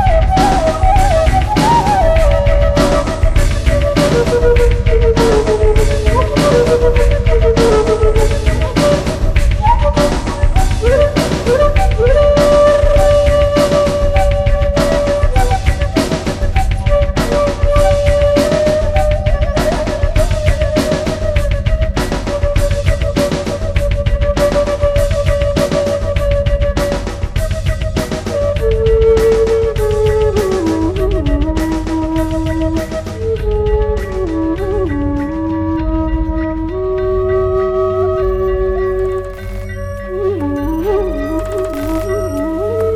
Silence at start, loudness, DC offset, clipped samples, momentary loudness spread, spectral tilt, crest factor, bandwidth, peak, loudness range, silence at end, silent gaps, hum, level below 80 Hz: 0 s; -14 LUFS; under 0.1%; under 0.1%; 7 LU; -6.5 dB/octave; 12 dB; 14.5 kHz; 0 dBFS; 6 LU; 0 s; none; none; -16 dBFS